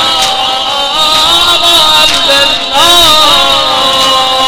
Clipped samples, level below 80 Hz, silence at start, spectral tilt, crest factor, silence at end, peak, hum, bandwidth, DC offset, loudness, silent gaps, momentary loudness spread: 4%; -34 dBFS; 0 s; -0.5 dB/octave; 8 dB; 0 s; 0 dBFS; none; over 20 kHz; under 0.1%; -5 LUFS; none; 6 LU